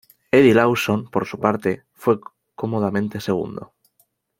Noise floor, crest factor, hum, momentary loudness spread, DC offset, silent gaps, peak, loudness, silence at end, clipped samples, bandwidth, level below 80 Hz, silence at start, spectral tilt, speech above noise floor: -65 dBFS; 20 dB; none; 12 LU; under 0.1%; none; -2 dBFS; -20 LUFS; 0.75 s; under 0.1%; 16.5 kHz; -58 dBFS; 0.35 s; -6.5 dB/octave; 46 dB